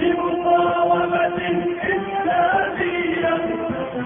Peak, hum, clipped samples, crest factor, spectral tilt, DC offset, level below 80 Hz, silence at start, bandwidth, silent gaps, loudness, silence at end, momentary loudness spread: -6 dBFS; none; under 0.1%; 12 dB; -10 dB/octave; under 0.1%; -52 dBFS; 0 s; 3.7 kHz; none; -20 LUFS; 0 s; 5 LU